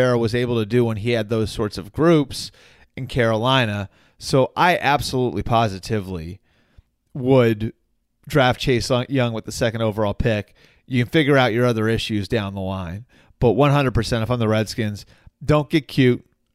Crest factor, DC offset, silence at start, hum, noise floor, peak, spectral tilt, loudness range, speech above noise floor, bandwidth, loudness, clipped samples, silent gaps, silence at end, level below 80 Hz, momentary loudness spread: 16 dB; under 0.1%; 0 s; none; -55 dBFS; -4 dBFS; -6 dB/octave; 2 LU; 35 dB; 15 kHz; -20 LUFS; under 0.1%; none; 0.35 s; -42 dBFS; 13 LU